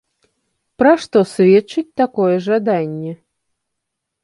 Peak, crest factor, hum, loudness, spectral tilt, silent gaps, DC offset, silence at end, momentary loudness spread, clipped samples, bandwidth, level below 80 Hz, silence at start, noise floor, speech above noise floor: -2 dBFS; 16 dB; none; -15 LUFS; -7 dB/octave; none; under 0.1%; 1.1 s; 12 LU; under 0.1%; 11.5 kHz; -60 dBFS; 0.8 s; -77 dBFS; 63 dB